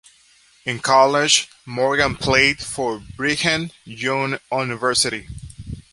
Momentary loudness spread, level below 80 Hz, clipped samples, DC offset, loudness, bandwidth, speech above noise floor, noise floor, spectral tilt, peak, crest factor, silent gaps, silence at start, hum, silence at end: 16 LU; -44 dBFS; under 0.1%; under 0.1%; -19 LUFS; 11.5 kHz; 34 dB; -54 dBFS; -2.5 dB/octave; -2 dBFS; 20 dB; none; 0.65 s; none; 0.1 s